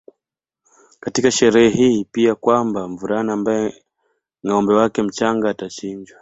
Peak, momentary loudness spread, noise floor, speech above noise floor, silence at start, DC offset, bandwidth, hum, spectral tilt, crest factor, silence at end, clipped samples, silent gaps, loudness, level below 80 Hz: -2 dBFS; 14 LU; -84 dBFS; 67 dB; 1.05 s; under 0.1%; 8.2 kHz; none; -4.5 dB/octave; 18 dB; 0.15 s; under 0.1%; none; -18 LUFS; -56 dBFS